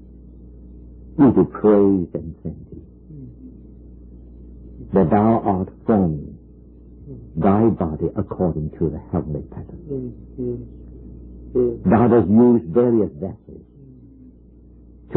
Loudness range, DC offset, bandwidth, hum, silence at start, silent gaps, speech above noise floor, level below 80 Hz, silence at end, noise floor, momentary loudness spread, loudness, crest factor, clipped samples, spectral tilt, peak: 8 LU; under 0.1%; 3.8 kHz; 60 Hz at -45 dBFS; 0.4 s; none; 28 dB; -42 dBFS; 0 s; -46 dBFS; 25 LU; -19 LUFS; 16 dB; under 0.1%; -14 dB/octave; -4 dBFS